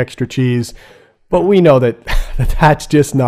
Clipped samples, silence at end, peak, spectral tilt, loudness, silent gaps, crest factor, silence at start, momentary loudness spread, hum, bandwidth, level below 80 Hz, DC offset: 0.4%; 0 s; 0 dBFS; -6.5 dB/octave; -13 LUFS; none; 12 dB; 0 s; 12 LU; none; 15.5 kHz; -22 dBFS; under 0.1%